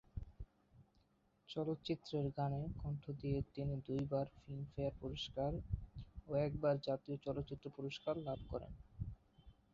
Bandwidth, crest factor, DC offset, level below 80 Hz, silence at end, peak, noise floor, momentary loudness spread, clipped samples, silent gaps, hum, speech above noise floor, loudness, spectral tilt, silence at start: 7.4 kHz; 18 dB; under 0.1%; -56 dBFS; 0.2 s; -26 dBFS; -76 dBFS; 12 LU; under 0.1%; none; none; 34 dB; -43 LUFS; -6.5 dB/octave; 0.15 s